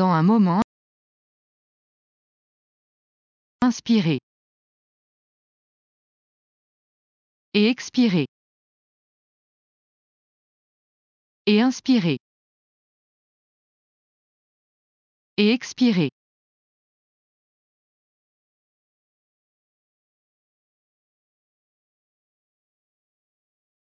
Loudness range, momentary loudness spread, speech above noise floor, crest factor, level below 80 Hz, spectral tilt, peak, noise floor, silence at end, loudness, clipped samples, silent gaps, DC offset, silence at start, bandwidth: 6 LU; 10 LU; over 71 dB; 22 dB; -70 dBFS; -6 dB/octave; -6 dBFS; under -90 dBFS; 7.9 s; -21 LUFS; under 0.1%; 0.64-3.59 s, 4.23-7.52 s, 8.28-11.45 s, 12.20-15.37 s; under 0.1%; 0 s; 7.4 kHz